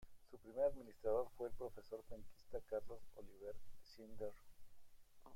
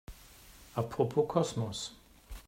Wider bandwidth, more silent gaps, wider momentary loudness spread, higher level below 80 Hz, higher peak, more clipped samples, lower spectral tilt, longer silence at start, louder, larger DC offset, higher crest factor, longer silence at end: about the same, 16.5 kHz vs 16 kHz; neither; second, 20 LU vs 24 LU; second, -64 dBFS vs -56 dBFS; second, -28 dBFS vs -14 dBFS; neither; about the same, -6.5 dB/octave vs -6 dB/octave; about the same, 0 s vs 0.1 s; second, -47 LUFS vs -34 LUFS; neither; about the same, 18 dB vs 20 dB; about the same, 0 s vs 0.05 s